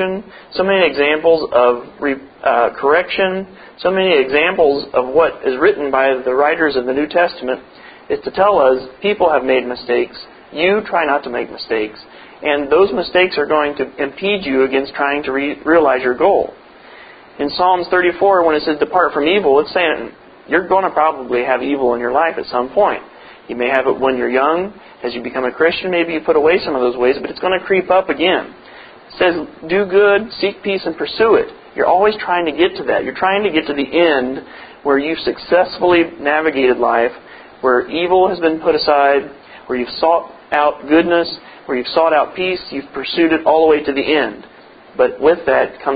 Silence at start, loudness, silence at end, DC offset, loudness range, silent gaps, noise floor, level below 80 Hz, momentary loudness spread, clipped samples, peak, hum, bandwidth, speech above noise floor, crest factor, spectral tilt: 0 s; -15 LUFS; 0 s; under 0.1%; 2 LU; none; -39 dBFS; -50 dBFS; 10 LU; under 0.1%; 0 dBFS; none; 5 kHz; 24 dB; 16 dB; -8.5 dB/octave